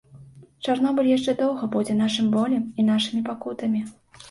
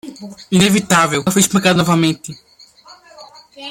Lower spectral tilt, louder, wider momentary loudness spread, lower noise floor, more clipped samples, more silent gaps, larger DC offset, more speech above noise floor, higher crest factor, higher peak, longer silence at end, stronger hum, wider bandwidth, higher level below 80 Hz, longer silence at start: first, -5.5 dB/octave vs -4 dB/octave; second, -23 LUFS vs -14 LUFS; second, 8 LU vs 20 LU; about the same, -47 dBFS vs -44 dBFS; neither; neither; neither; second, 25 dB vs 29 dB; about the same, 14 dB vs 16 dB; second, -10 dBFS vs 0 dBFS; about the same, 0 s vs 0 s; neither; second, 11.5 kHz vs 16.5 kHz; second, -64 dBFS vs -52 dBFS; about the same, 0.15 s vs 0.05 s